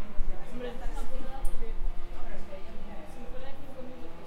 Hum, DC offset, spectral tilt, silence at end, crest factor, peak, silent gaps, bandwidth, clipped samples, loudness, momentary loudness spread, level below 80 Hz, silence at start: none; under 0.1%; -6 dB/octave; 0 s; 14 dB; -10 dBFS; none; 4.1 kHz; under 0.1%; -42 LUFS; 6 LU; -34 dBFS; 0 s